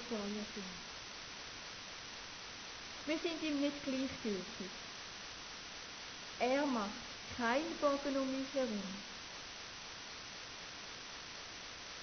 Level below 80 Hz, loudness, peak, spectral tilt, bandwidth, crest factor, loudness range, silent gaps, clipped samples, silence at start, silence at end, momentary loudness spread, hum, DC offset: -66 dBFS; -41 LUFS; -22 dBFS; -3 dB/octave; 6.6 kHz; 20 dB; 6 LU; none; under 0.1%; 0 s; 0 s; 11 LU; none; under 0.1%